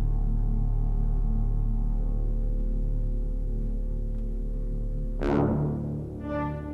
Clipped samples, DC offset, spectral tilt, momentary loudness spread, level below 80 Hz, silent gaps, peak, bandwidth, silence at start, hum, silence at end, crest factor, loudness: under 0.1%; under 0.1%; -10 dB/octave; 8 LU; -28 dBFS; none; -12 dBFS; 3.1 kHz; 0 s; none; 0 s; 14 dB; -31 LUFS